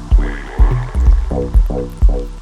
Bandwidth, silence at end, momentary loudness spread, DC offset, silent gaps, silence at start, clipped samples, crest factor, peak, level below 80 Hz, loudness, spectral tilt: 5.8 kHz; 0 s; 2 LU; under 0.1%; none; 0 s; under 0.1%; 12 dB; 0 dBFS; -14 dBFS; -17 LUFS; -8 dB/octave